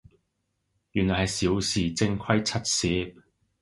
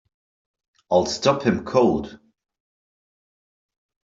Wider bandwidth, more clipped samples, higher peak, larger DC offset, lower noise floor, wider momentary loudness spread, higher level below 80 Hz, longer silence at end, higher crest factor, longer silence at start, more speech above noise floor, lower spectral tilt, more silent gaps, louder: first, 11.5 kHz vs 7.8 kHz; neither; about the same, -6 dBFS vs -4 dBFS; neither; second, -77 dBFS vs under -90 dBFS; about the same, 5 LU vs 6 LU; first, -46 dBFS vs -56 dBFS; second, 0.5 s vs 1.9 s; about the same, 22 dB vs 22 dB; about the same, 0.95 s vs 0.9 s; second, 51 dB vs over 70 dB; second, -4 dB/octave vs -5.5 dB/octave; neither; second, -26 LUFS vs -21 LUFS